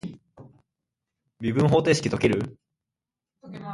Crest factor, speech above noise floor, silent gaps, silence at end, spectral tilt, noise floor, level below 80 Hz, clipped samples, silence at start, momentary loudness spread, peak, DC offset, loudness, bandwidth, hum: 20 dB; 66 dB; none; 0 s; -6 dB/octave; -88 dBFS; -54 dBFS; under 0.1%; 0.05 s; 20 LU; -6 dBFS; under 0.1%; -23 LUFS; 11.5 kHz; none